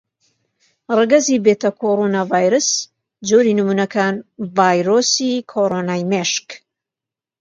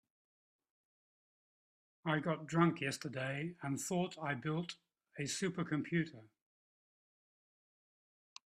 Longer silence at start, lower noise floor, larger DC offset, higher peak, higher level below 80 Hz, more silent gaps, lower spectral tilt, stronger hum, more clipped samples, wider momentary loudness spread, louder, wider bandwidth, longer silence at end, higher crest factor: second, 0.9 s vs 2.05 s; about the same, -87 dBFS vs under -90 dBFS; neither; first, 0 dBFS vs -18 dBFS; first, -66 dBFS vs -80 dBFS; neither; about the same, -4 dB/octave vs -5 dB/octave; neither; neither; second, 9 LU vs 12 LU; first, -16 LUFS vs -39 LUFS; second, 9.4 kHz vs 13.5 kHz; second, 0.85 s vs 2.25 s; second, 18 dB vs 24 dB